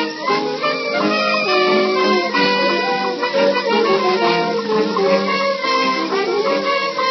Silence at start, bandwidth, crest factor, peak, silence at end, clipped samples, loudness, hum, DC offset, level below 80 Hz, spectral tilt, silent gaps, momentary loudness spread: 0 s; 6.4 kHz; 14 dB; -2 dBFS; 0 s; under 0.1%; -16 LUFS; none; under 0.1%; -78 dBFS; -4.5 dB/octave; none; 4 LU